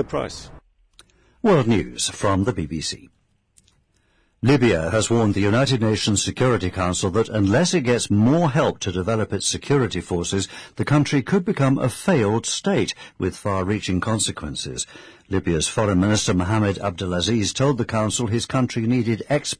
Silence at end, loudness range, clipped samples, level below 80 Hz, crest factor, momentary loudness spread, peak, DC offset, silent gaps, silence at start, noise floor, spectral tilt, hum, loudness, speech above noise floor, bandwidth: 0.05 s; 4 LU; under 0.1%; -46 dBFS; 14 dB; 9 LU; -8 dBFS; under 0.1%; none; 0 s; -63 dBFS; -5 dB/octave; none; -21 LUFS; 42 dB; 11 kHz